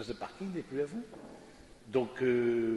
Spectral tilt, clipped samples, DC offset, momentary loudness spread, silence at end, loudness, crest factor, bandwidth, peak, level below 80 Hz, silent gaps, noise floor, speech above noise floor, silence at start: -7 dB/octave; under 0.1%; under 0.1%; 21 LU; 0 s; -34 LUFS; 18 dB; 11.5 kHz; -16 dBFS; -64 dBFS; none; -55 dBFS; 21 dB; 0 s